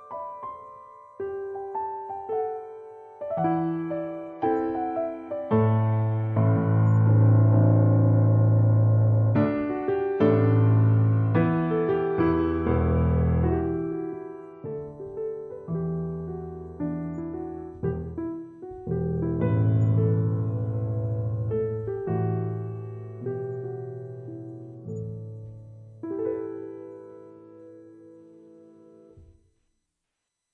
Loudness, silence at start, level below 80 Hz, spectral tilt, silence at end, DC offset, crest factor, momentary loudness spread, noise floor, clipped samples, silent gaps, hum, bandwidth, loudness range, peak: -25 LUFS; 0 s; -48 dBFS; -12 dB/octave; 1.35 s; under 0.1%; 16 dB; 18 LU; -82 dBFS; under 0.1%; none; none; 3.3 kHz; 15 LU; -10 dBFS